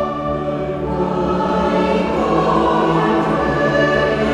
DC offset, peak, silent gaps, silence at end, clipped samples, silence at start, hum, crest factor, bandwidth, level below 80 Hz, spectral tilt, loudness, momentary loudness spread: under 0.1%; -4 dBFS; none; 0 s; under 0.1%; 0 s; none; 14 dB; 11 kHz; -36 dBFS; -7 dB/octave; -17 LUFS; 6 LU